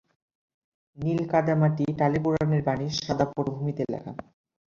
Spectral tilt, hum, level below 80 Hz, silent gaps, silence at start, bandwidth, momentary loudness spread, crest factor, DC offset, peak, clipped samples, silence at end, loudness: -7 dB/octave; none; -56 dBFS; none; 0.95 s; 7.2 kHz; 9 LU; 20 dB; under 0.1%; -8 dBFS; under 0.1%; 0.45 s; -26 LUFS